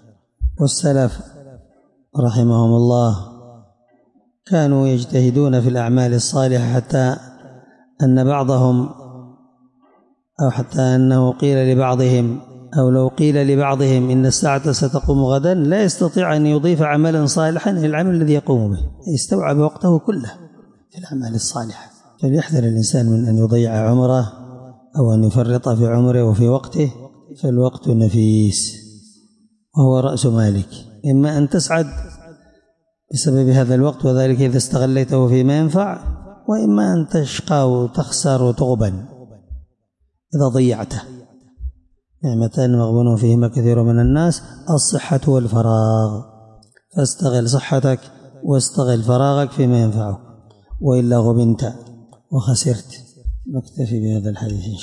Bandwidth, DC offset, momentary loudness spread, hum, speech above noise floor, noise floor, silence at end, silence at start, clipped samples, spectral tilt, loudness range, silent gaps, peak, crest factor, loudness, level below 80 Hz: 11.5 kHz; under 0.1%; 11 LU; none; 51 dB; -66 dBFS; 0 s; 0.4 s; under 0.1%; -6.5 dB/octave; 4 LU; none; -4 dBFS; 12 dB; -17 LUFS; -38 dBFS